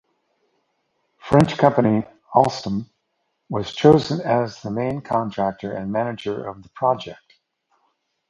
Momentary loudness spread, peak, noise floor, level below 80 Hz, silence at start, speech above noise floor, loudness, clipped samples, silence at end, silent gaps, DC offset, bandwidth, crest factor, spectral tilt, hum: 14 LU; 0 dBFS; -73 dBFS; -52 dBFS; 1.25 s; 53 dB; -21 LUFS; under 0.1%; 1.15 s; none; under 0.1%; 11.5 kHz; 22 dB; -7 dB/octave; none